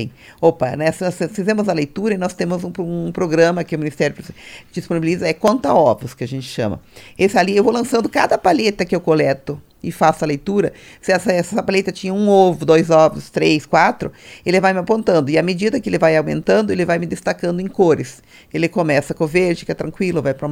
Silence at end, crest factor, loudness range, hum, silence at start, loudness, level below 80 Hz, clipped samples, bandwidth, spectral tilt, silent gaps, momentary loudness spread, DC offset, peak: 0 s; 16 dB; 4 LU; none; 0 s; -17 LUFS; -50 dBFS; under 0.1%; 16.5 kHz; -6 dB/octave; none; 10 LU; under 0.1%; 0 dBFS